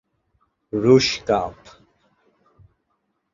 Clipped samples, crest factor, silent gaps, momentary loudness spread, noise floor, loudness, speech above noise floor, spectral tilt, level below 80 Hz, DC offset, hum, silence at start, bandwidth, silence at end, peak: under 0.1%; 22 dB; none; 14 LU; -72 dBFS; -19 LUFS; 54 dB; -5 dB/octave; -52 dBFS; under 0.1%; none; 0.75 s; 7.6 kHz; 1.8 s; -2 dBFS